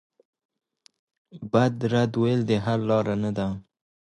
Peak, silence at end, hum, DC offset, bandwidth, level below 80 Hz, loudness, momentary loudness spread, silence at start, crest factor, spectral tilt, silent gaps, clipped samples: -6 dBFS; 0.45 s; none; under 0.1%; 9.8 kHz; -56 dBFS; -24 LUFS; 8 LU; 1.35 s; 20 dB; -7.5 dB/octave; none; under 0.1%